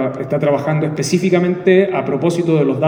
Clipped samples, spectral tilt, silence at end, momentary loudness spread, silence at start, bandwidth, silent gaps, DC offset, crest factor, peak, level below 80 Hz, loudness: under 0.1%; -6.5 dB/octave; 0 s; 5 LU; 0 s; 16.5 kHz; none; under 0.1%; 14 dB; 0 dBFS; -58 dBFS; -16 LUFS